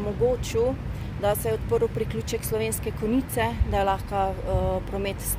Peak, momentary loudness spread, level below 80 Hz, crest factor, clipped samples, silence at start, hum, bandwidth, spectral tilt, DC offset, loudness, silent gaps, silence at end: -10 dBFS; 4 LU; -34 dBFS; 14 dB; under 0.1%; 0 s; none; 16 kHz; -5.5 dB/octave; under 0.1%; -26 LUFS; none; 0 s